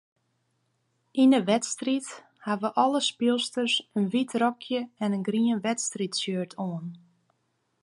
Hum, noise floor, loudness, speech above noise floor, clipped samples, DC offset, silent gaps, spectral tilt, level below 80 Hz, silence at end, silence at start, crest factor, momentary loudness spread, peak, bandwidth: none; -75 dBFS; -27 LUFS; 48 dB; under 0.1%; under 0.1%; none; -4 dB/octave; -80 dBFS; 0.85 s; 1.15 s; 18 dB; 11 LU; -8 dBFS; 11.5 kHz